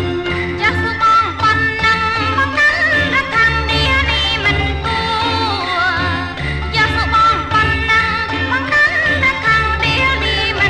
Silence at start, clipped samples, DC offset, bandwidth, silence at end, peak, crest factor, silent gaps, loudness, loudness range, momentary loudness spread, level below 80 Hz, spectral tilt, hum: 0 s; under 0.1%; under 0.1%; 11.5 kHz; 0 s; -4 dBFS; 12 dB; none; -14 LUFS; 2 LU; 5 LU; -28 dBFS; -4.5 dB/octave; none